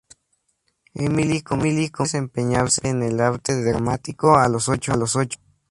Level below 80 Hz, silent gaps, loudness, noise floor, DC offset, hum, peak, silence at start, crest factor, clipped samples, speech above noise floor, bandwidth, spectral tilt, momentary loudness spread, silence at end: -46 dBFS; none; -21 LUFS; -70 dBFS; under 0.1%; none; 0 dBFS; 0.95 s; 20 dB; under 0.1%; 50 dB; 11.5 kHz; -5 dB/octave; 8 LU; 0.35 s